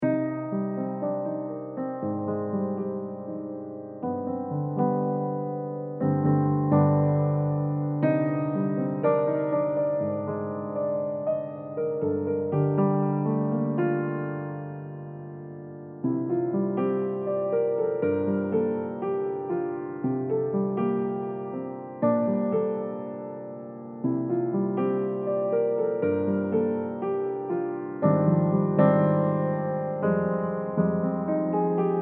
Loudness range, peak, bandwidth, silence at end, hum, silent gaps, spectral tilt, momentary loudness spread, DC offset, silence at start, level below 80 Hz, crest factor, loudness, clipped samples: 6 LU; -8 dBFS; 3.4 kHz; 0 s; none; none; -10.5 dB/octave; 11 LU; under 0.1%; 0 s; -72 dBFS; 18 dB; -27 LUFS; under 0.1%